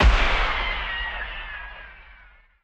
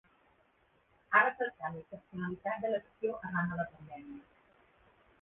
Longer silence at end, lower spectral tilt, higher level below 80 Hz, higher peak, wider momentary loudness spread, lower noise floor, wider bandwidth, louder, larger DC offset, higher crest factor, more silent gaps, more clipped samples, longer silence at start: second, 0.5 s vs 1 s; about the same, -4.5 dB/octave vs -4.5 dB/octave; first, -26 dBFS vs -70 dBFS; first, -6 dBFS vs -12 dBFS; about the same, 21 LU vs 21 LU; second, -52 dBFS vs -71 dBFS; first, 8.2 kHz vs 4 kHz; first, -25 LUFS vs -34 LUFS; neither; second, 18 dB vs 26 dB; neither; neither; second, 0 s vs 1.1 s